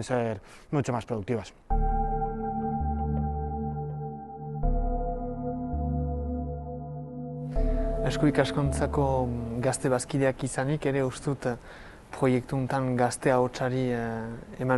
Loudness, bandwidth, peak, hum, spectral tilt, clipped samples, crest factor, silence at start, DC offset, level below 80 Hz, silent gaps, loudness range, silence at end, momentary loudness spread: -29 LUFS; 12 kHz; -8 dBFS; none; -6.5 dB/octave; under 0.1%; 20 dB; 0 s; under 0.1%; -36 dBFS; none; 5 LU; 0 s; 11 LU